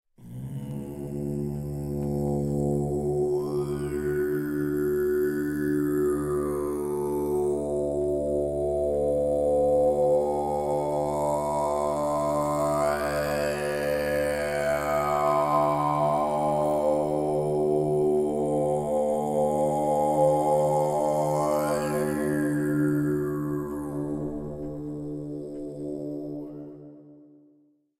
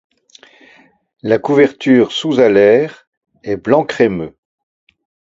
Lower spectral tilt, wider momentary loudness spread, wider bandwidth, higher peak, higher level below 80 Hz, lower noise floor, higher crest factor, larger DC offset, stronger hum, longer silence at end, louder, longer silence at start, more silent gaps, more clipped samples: about the same, -7 dB/octave vs -6.5 dB/octave; second, 11 LU vs 15 LU; first, 16 kHz vs 7.8 kHz; second, -12 dBFS vs 0 dBFS; first, -48 dBFS vs -54 dBFS; first, -63 dBFS vs -48 dBFS; about the same, 14 dB vs 16 dB; neither; neither; second, 0.75 s vs 0.95 s; second, -26 LUFS vs -13 LUFS; second, 0.2 s vs 1.25 s; second, none vs 3.07-3.21 s; neither